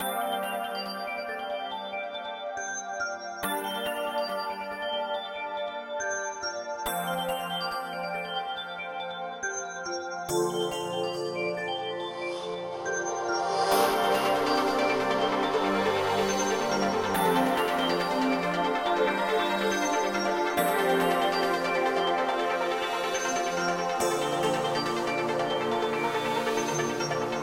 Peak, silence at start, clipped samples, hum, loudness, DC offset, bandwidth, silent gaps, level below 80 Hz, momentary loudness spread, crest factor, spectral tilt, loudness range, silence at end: -12 dBFS; 0 s; under 0.1%; none; -28 LUFS; under 0.1%; 16 kHz; none; -62 dBFS; 8 LU; 16 dB; -3.5 dB/octave; 6 LU; 0 s